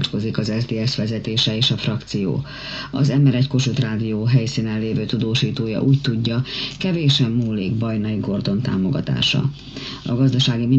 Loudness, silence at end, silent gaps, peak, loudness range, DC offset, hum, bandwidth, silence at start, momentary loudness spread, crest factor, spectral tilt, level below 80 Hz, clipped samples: -20 LUFS; 0 s; none; -4 dBFS; 1 LU; under 0.1%; none; 8 kHz; 0 s; 7 LU; 16 dB; -6 dB/octave; -46 dBFS; under 0.1%